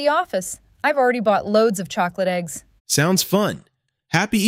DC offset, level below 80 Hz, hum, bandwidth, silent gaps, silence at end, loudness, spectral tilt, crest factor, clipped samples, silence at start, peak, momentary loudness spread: under 0.1%; -58 dBFS; none; 16.5 kHz; 2.80-2.85 s; 0 s; -20 LUFS; -4 dB/octave; 18 dB; under 0.1%; 0 s; -2 dBFS; 10 LU